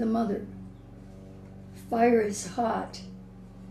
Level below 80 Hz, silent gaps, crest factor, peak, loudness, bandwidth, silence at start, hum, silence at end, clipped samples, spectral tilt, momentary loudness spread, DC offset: -54 dBFS; none; 20 dB; -10 dBFS; -28 LUFS; 14 kHz; 0 s; none; 0 s; under 0.1%; -5.5 dB/octave; 24 LU; under 0.1%